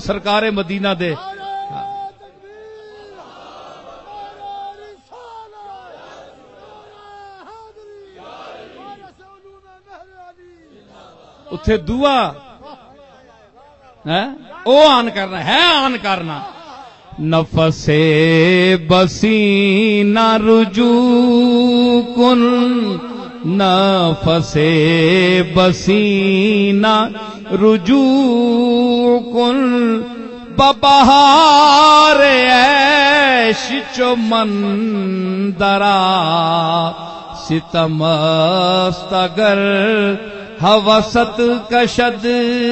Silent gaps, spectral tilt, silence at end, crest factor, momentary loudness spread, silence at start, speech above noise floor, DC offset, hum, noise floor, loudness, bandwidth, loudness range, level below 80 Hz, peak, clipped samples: none; -5.5 dB/octave; 0 s; 14 dB; 16 LU; 0 s; 34 dB; under 0.1%; none; -46 dBFS; -12 LUFS; 8.4 kHz; 12 LU; -42 dBFS; 0 dBFS; under 0.1%